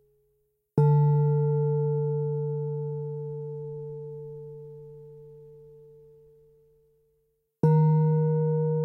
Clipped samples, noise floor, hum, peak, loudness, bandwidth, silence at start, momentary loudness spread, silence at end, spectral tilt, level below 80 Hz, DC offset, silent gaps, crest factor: under 0.1%; -73 dBFS; none; -10 dBFS; -26 LUFS; 2.2 kHz; 0.75 s; 22 LU; 0 s; -13 dB/octave; -66 dBFS; under 0.1%; none; 18 dB